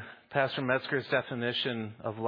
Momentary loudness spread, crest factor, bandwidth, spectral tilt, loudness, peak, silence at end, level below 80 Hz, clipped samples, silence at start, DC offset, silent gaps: 5 LU; 20 dB; 5.2 kHz; -7.5 dB/octave; -31 LUFS; -12 dBFS; 0 s; -74 dBFS; under 0.1%; 0 s; under 0.1%; none